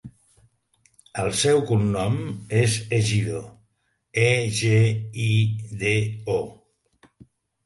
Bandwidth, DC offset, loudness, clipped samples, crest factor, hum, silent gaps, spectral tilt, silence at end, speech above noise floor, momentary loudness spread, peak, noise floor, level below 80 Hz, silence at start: 11.5 kHz; under 0.1%; -23 LUFS; under 0.1%; 18 dB; none; none; -5 dB/octave; 1.1 s; 49 dB; 9 LU; -6 dBFS; -71 dBFS; -52 dBFS; 0.05 s